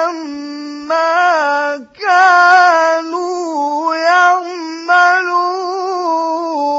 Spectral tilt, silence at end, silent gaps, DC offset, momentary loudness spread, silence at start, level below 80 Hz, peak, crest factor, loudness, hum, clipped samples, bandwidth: -1 dB/octave; 0 s; none; under 0.1%; 15 LU; 0 s; -68 dBFS; 0 dBFS; 14 dB; -12 LUFS; none; under 0.1%; 8 kHz